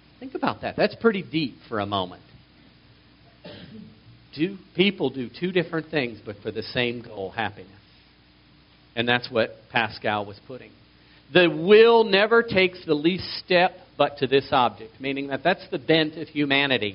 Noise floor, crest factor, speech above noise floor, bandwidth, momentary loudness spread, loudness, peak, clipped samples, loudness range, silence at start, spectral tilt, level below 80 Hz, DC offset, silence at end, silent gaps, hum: -55 dBFS; 22 dB; 32 dB; 5.6 kHz; 16 LU; -23 LUFS; -2 dBFS; under 0.1%; 11 LU; 0.2 s; -3 dB/octave; -60 dBFS; under 0.1%; 0 s; none; none